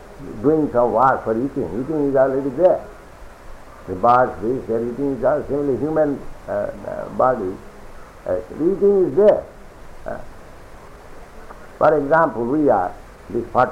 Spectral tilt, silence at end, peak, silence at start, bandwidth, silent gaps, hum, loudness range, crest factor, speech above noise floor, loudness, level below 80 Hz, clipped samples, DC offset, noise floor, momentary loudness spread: -8.5 dB/octave; 0 s; -4 dBFS; 0 s; 13 kHz; none; none; 3 LU; 16 dB; 21 dB; -19 LUFS; -42 dBFS; under 0.1%; under 0.1%; -40 dBFS; 16 LU